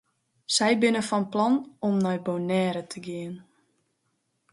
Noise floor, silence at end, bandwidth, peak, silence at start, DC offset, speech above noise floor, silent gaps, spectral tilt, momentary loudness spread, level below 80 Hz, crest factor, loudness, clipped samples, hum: -75 dBFS; 1.1 s; 11.5 kHz; -10 dBFS; 0.5 s; under 0.1%; 49 dB; none; -4.5 dB/octave; 14 LU; -72 dBFS; 18 dB; -26 LUFS; under 0.1%; none